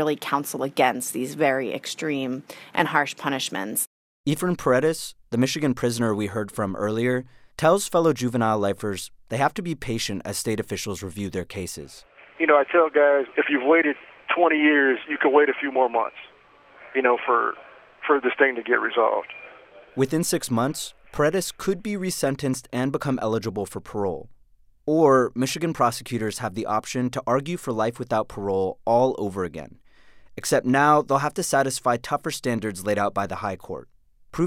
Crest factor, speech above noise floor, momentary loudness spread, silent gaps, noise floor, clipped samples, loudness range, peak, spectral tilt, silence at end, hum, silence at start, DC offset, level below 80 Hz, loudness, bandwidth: 20 dB; 32 dB; 13 LU; 3.87-4.24 s; -55 dBFS; under 0.1%; 5 LU; -4 dBFS; -4.5 dB/octave; 0 s; none; 0 s; under 0.1%; -56 dBFS; -23 LUFS; 16.5 kHz